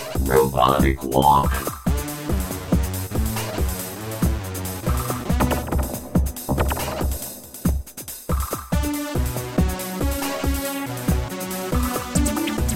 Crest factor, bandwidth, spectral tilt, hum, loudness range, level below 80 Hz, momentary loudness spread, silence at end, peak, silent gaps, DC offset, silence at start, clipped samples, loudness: 20 dB; 16.5 kHz; -5.5 dB/octave; none; 4 LU; -28 dBFS; 9 LU; 0 s; -4 dBFS; none; 0.3%; 0 s; under 0.1%; -23 LUFS